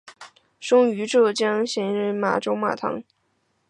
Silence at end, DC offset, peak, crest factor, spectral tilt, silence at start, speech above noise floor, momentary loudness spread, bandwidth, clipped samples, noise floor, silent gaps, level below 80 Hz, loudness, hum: 0.65 s; under 0.1%; -6 dBFS; 16 dB; -4.5 dB/octave; 0.05 s; 48 dB; 10 LU; 10.5 kHz; under 0.1%; -69 dBFS; none; -70 dBFS; -22 LUFS; none